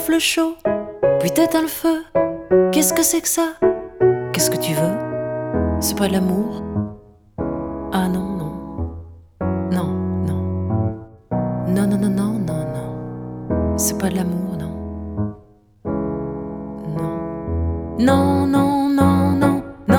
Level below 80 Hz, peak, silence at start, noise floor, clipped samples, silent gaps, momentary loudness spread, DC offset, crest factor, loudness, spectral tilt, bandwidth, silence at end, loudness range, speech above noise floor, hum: -38 dBFS; -2 dBFS; 0 s; -48 dBFS; under 0.1%; none; 13 LU; under 0.1%; 18 dB; -20 LUFS; -5 dB/octave; over 20 kHz; 0 s; 7 LU; 30 dB; none